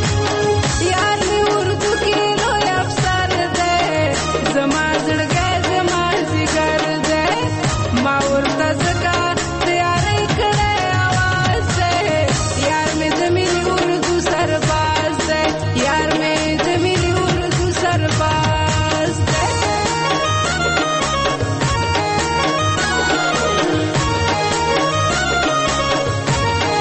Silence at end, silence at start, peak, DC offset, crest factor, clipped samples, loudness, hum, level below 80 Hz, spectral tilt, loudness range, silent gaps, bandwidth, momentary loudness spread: 0 s; 0 s; -4 dBFS; under 0.1%; 12 dB; under 0.1%; -17 LUFS; none; -32 dBFS; -4 dB/octave; 1 LU; none; 8.8 kHz; 2 LU